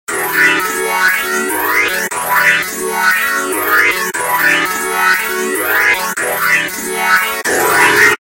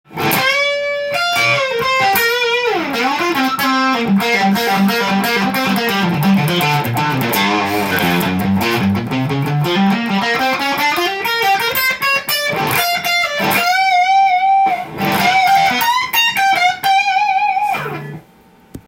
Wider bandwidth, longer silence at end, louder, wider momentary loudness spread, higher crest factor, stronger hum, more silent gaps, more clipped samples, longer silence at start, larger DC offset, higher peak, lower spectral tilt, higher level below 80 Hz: about the same, 17.5 kHz vs 17 kHz; about the same, 0.05 s vs 0.1 s; about the same, -12 LUFS vs -14 LUFS; about the same, 5 LU vs 5 LU; about the same, 14 dB vs 14 dB; neither; neither; neither; about the same, 0.1 s vs 0.1 s; neither; about the same, 0 dBFS vs -2 dBFS; second, -1 dB/octave vs -4 dB/octave; about the same, -52 dBFS vs -52 dBFS